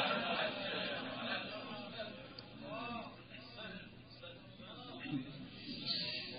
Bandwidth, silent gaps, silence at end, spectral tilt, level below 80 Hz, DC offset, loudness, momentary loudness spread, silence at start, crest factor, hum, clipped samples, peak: 5.2 kHz; none; 0 s; -1.5 dB/octave; -74 dBFS; under 0.1%; -42 LUFS; 15 LU; 0 s; 20 dB; none; under 0.1%; -24 dBFS